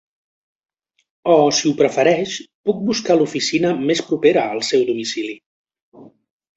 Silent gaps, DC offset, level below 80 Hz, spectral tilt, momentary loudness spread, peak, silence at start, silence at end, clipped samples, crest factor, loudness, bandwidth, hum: 2.54-2.64 s, 5.46-5.65 s, 5.82-5.92 s; under 0.1%; -62 dBFS; -4 dB/octave; 10 LU; -2 dBFS; 1.25 s; 0.55 s; under 0.1%; 18 dB; -18 LUFS; 8.2 kHz; none